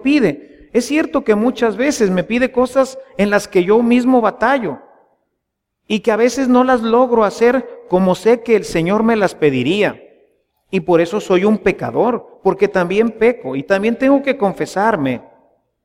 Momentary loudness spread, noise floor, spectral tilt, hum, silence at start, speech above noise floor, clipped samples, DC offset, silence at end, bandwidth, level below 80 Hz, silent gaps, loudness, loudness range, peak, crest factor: 7 LU; -75 dBFS; -6 dB/octave; none; 0 s; 60 dB; under 0.1%; under 0.1%; 0.65 s; 15.5 kHz; -48 dBFS; none; -15 LUFS; 2 LU; -2 dBFS; 14 dB